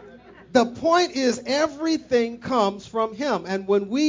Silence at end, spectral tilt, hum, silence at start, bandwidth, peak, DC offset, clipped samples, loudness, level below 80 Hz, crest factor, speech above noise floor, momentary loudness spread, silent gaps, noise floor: 0 s; -4 dB/octave; none; 0 s; 7.6 kHz; -6 dBFS; under 0.1%; under 0.1%; -23 LUFS; -58 dBFS; 16 dB; 24 dB; 6 LU; none; -46 dBFS